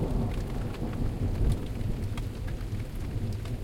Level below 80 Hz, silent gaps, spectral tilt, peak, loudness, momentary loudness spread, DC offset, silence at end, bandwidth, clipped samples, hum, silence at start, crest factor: -34 dBFS; none; -7.5 dB/octave; -16 dBFS; -33 LUFS; 6 LU; under 0.1%; 0 s; 16.5 kHz; under 0.1%; none; 0 s; 14 dB